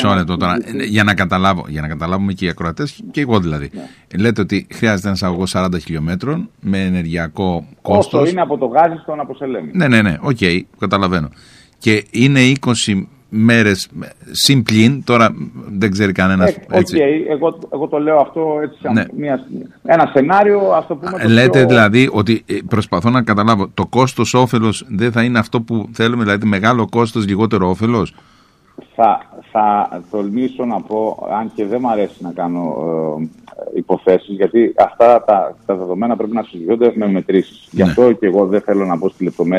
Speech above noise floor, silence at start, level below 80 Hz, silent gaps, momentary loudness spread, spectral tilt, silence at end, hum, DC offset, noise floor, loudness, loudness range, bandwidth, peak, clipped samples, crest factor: 28 dB; 0 s; -44 dBFS; none; 11 LU; -6 dB/octave; 0 s; none; under 0.1%; -43 dBFS; -15 LUFS; 6 LU; 15 kHz; 0 dBFS; under 0.1%; 14 dB